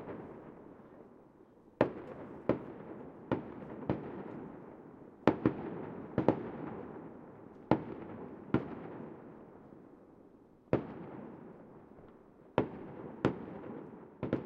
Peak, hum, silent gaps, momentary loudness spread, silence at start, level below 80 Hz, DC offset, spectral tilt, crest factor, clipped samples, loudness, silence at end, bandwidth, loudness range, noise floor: -6 dBFS; none; none; 22 LU; 0 s; -64 dBFS; under 0.1%; -9 dB/octave; 32 dB; under 0.1%; -38 LUFS; 0 s; 6.8 kHz; 5 LU; -60 dBFS